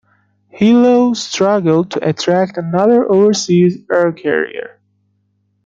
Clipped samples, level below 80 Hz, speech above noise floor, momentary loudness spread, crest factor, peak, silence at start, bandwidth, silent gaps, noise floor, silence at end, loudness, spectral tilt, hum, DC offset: under 0.1%; -58 dBFS; 50 dB; 7 LU; 12 dB; -2 dBFS; 0.55 s; 7.8 kHz; none; -62 dBFS; 1 s; -13 LUFS; -5.5 dB/octave; 50 Hz at -45 dBFS; under 0.1%